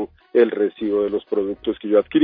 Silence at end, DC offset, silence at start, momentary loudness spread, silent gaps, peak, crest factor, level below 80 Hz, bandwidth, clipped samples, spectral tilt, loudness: 0 s; under 0.1%; 0 s; 6 LU; none; -4 dBFS; 16 dB; -56 dBFS; 4.7 kHz; under 0.1%; -9.5 dB/octave; -21 LUFS